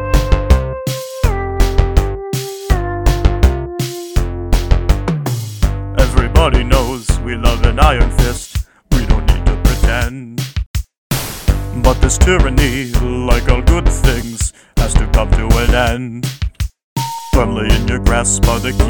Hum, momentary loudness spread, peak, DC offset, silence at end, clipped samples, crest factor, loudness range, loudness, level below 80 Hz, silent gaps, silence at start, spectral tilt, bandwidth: none; 10 LU; 0 dBFS; 0.8%; 0 s; 0.2%; 14 dB; 3 LU; -16 LUFS; -16 dBFS; 10.66-10.74 s, 10.98-11.10 s, 16.84-16.96 s; 0 s; -5 dB/octave; 19.5 kHz